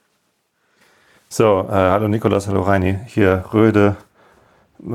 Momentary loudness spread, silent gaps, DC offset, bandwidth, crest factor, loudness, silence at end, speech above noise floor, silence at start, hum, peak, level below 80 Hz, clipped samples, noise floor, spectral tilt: 6 LU; none; under 0.1%; 14.5 kHz; 16 dB; -17 LUFS; 0 s; 51 dB; 1.3 s; none; -2 dBFS; -48 dBFS; under 0.1%; -66 dBFS; -7 dB/octave